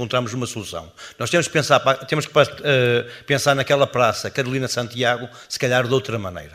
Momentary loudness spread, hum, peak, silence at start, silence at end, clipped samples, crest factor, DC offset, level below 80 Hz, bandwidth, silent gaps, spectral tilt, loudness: 11 LU; none; 0 dBFS; 0 s; 0.05 s; under 0.1%; 20 dB; under 0.1%; -56 dBFS; 15.5 kHz; none; -4 dB/octave; -20 LUFS